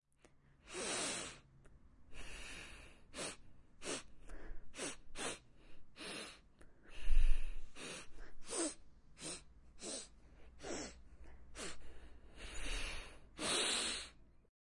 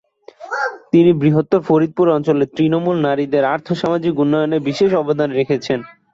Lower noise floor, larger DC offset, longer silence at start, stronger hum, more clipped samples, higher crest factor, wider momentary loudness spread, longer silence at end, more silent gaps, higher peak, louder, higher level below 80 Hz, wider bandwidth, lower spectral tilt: first, -68 dBFS vs -37 dBFS; neither; first, 0.65 s vs 0.4 s; neither; neither; first, 22 dB vs 14 dB; first, 20 LU vs 7 LU; about the same, 0.4 s vs 0.3 s; neither; second, -18 dBFS vs -2 dBFS; second, -44 LUFS vs -16 LUFS; first, -44 dBFS vs -56 dBFS; first, 11.5 kHz vs 7.6 kHz; second, -2 dB/octave vs -7.5 dB/octave